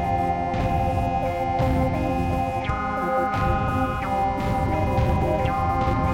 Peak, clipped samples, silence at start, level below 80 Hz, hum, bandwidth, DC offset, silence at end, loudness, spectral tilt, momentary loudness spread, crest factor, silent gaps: -10 dBFS; under 0.1%; 0 s; -32 dBFS; none; 16.5 kHz; under 0.1%; 0 s; -24 LUFS; -7.5 dB/octave; 2 LU; 12 dB; none